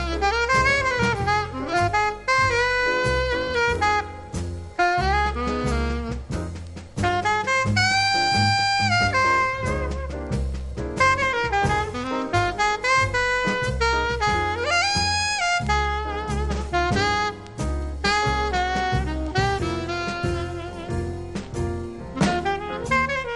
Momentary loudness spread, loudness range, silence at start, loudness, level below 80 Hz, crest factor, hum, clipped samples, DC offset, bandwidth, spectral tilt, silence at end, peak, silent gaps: 11 LU; 5 LU; 0 s; -22 LUFS; -34 dBFS; 16 dB; none; under 0.1%; under 0.1%; 11.5 kHz; -4 dB/octave; 0 s; -8 dBFS; none